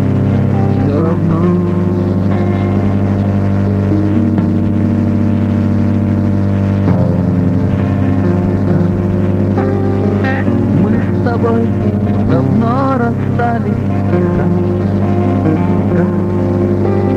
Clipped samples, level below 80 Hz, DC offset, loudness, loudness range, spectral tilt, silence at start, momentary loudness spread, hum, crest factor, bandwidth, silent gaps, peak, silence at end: under 0.1%; -34 dBFS; 0.5%; -13 LUFS; 0 LU; -10 dB/octave; 0 s; 2 LU; 50 Hz at -40 dBFS; 12 dB; 5.8 kHz; none; 0 dBFS; 0 s